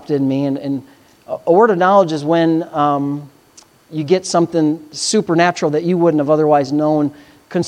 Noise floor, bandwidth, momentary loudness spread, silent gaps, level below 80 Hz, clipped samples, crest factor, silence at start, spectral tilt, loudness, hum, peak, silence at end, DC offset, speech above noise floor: -48 dBFS; 11.5 kHz; 12 LU; none; -64 dBFS; under 0.1%; 14 dB; 0.1 s; -5.5 dB/octave; -15 LUFS; none; 0 dBFS; 0 s; under 0.1%; 33 dB